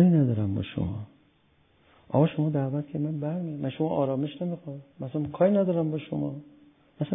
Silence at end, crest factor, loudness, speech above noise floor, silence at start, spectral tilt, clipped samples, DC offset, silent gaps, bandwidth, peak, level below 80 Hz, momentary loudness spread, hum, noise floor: 0 s; 18 dB; -28 LUFS; 37 dB; 0 s; -12.5 dB/octave; under 0.1%; under 0.1%; none; 3.8 kHz; -8 dBFS; -54 dBFS; 13 LU; none; -65 dBFS